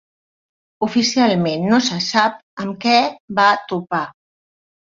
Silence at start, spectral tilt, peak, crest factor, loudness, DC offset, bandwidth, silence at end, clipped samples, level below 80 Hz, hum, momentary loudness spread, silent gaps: 0.8 s; -4 dB/octave; -2 dBFS; 18 dB; -17 LUFS; under 0.1%; 7.6 kHz; 0.85 s; under 0.1%; -62 dBFS; none; 9 LU; 2.43-2.57 s, 3.20-3.28 s